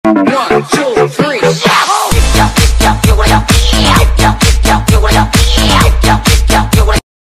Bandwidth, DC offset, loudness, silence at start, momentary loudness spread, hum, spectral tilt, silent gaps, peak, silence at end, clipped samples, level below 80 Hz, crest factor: 15 kHz; under 0.1%; -9 LUFS; 0.05 s; 3 LU; none; -4.5 dB/octave; none; 0 dBFS; 0.4 s; 0.7%; -12 dBFS; 8 dB